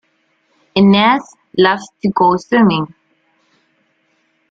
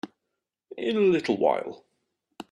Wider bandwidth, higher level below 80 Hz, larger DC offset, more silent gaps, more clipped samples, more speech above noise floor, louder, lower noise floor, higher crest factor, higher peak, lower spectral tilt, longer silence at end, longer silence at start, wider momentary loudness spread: second, 7.6 kHz vs 10 kHz; first, -54 dBFS vs -72 dBFS; neither; neither; neither; second, 49 dB vs 59 dB; first, -13 LUFS vs -25 LUFS; second, -61 dBFS vs -83 dBFS; second, 14 dB vs 20 dB; first, -2 dBFS vs -8 dBFS; about the same, -6.5 dB/octave vs -6.5 dB/octave; first, 1.65 s vs 0.1 s; first, 0.75 s vs 0.05 s; second, 11 LU vs 22 LU